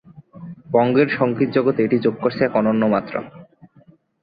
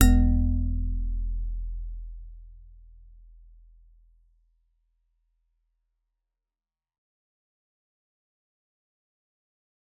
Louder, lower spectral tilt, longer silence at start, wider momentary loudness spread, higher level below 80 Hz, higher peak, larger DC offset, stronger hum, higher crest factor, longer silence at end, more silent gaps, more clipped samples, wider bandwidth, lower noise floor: first, -19 LUFS vs -29 LUFS; first, -10.5 dB/octave vs -7.5 dB/octave; first, 0.15 s vs 0 s; second, 20 LU vs 24 LU; second, -60 dBFS vs -32 dBFS; about the same, -2 dBFS vs -4 dBFS; neither; neither; second, 18 dB vs 26 dB; second, 0.8 s vs 7.35 s; neither; neither; first, 5 kHz vs 4 kHz; second, -52 dBFS vs under -90 dBFS